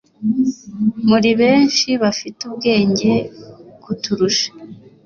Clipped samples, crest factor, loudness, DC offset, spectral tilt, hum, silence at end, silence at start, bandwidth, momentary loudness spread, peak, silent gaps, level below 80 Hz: under 0.1%; 14 dB; -16 LUFS; under 0.1%; -4.5 dB/octave; none; 0.25 s; 0.2 s; 7.2 kHz; 12 LU; -2 dBFS; none; -54 dBFS